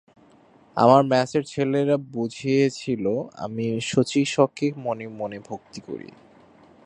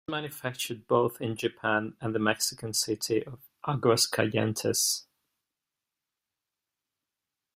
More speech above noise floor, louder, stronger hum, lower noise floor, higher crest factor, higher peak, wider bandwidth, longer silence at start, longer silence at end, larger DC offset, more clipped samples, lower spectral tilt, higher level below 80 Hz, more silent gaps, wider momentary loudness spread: second, 32 dB vs 59 dB; first, -23 LUFS vs -28 LUFS; neither; second, -55 dBFS vs -88 dBFS; about the same, 22 dB vs 22 dB; first, -2 dBFS vs -8 dBFS; second, 10.5 kHz vs 16 kHz; first, 0.75 s vs 0.1 s; second, 0.8 s vs 2.55 s; neither; neither; first, -6 dB/octave vs -3.5 dB/octave; about the same, -64 dBFS vs -68 dBFS; neither; first, 19 LU vs 9 LU